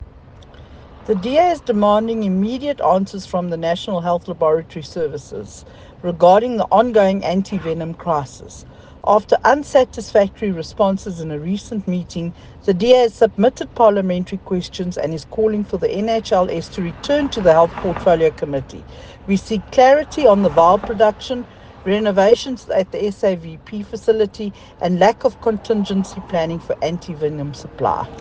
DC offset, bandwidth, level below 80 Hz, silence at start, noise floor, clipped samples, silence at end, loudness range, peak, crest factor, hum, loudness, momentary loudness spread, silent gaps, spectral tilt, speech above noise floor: under 0.1%; 9.4 kHz; -44 dBFS; 0 s; -41 dBFS; under 0.1%; 0 s; 4 LU; 0 dBFS; 18 dB; none; -18 LUFS; 14 LU; none; -6.5 dB/octave; 24 dB